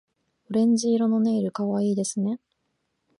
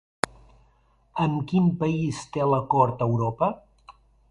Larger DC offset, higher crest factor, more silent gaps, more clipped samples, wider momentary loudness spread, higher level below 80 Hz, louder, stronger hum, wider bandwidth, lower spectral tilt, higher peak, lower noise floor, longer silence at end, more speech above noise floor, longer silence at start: neither; second, 12 dB vs 24 dB; neither; neither; about the same, 7 LU vs 9 LU; second, -72 dBFS vs -54 dBFS; about the same, -24 LUFS vs -25 LUFS; neither; about the same, 11.5 kHz vs 11.5 kHz; about the same, -6 dB/octave vs -7 dB/octave; second, -12 dBFS vs 0 dBFS; first, -75 dBFS vs -62 dBFS; first, 0.85 s vs 0.4 s; first, 53 dB vs 39 dB; second, 0.5 s vs 1.15 s